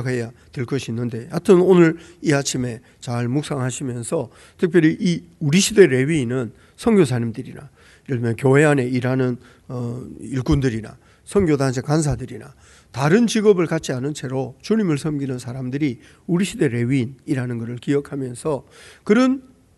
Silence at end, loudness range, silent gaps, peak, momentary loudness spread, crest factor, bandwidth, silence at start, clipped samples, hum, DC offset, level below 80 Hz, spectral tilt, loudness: 0.4 s; 4 LU; none; 0 dBFS; 14 LU; 20 dB; 12 kHz; 0 s; under 0.1%; none; under 0.1%; -44 dBFS; -6 dB/octave; -20 LUFS